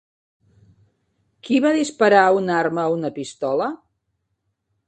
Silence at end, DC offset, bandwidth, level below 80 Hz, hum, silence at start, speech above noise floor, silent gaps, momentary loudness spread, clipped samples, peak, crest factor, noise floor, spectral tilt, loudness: 1.15 s; under 0.1%; 9 kHz; -68 dBFS; none; 1.45 s; 55 dB; none; 13 LU; under 0.1%; 0 dBFS; 22 dB; -74 dBFS; -5 dB/octave; -19 LUFS